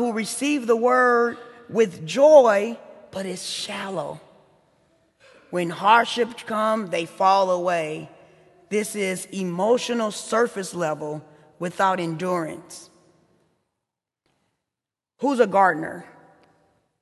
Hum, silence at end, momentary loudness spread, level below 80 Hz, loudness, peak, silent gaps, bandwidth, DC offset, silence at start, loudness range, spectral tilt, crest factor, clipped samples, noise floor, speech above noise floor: none; 0.95 s; 16 LU; -72 dBFS; -22 LUFS; -2 dBFS; none; 12.5 kHz; under 0.1%; 0 s; 9 LU; -4.5 dB/octave; 22 dB; under 0.1%; -88 dBFS; 67 dB